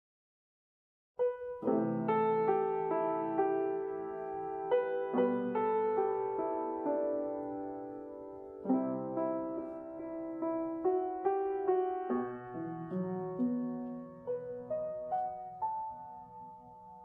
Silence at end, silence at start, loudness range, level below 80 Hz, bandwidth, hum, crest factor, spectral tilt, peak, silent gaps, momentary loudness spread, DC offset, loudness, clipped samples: 0 s; 1.2 s; 5 LU; -74 dBFS; 3.8 kHz; none; 16 dB; -10.5 dB/octave; -18 dBFS; none; 12 LU; under 0.1%; -35 LUFS; under 0.1%